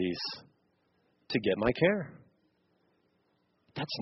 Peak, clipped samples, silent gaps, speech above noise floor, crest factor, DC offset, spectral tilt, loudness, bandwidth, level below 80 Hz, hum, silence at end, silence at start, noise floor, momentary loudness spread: -12 dBFS; under 0.1%; none; 44 dB; 22 dB; under 0.1%; -4 dB/octave; -31 LUFS; 6 kHz; -60 dBFS; none; 0 s; 0 s; -74 dBFS; 19 LU